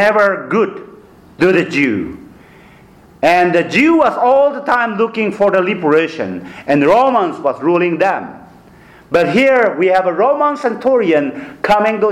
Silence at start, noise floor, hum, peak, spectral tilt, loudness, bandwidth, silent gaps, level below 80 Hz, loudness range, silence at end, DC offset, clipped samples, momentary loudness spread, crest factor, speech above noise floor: 0 s; -43 dBFS; none; -2 dBFS; -6 dB/octave; -13 LUFS; 13.5 kHz; none; -52 dBFS; 3 LU; 0 s; under 0.1%; under 0.1%; 9 LU; 12 dB; 30 dB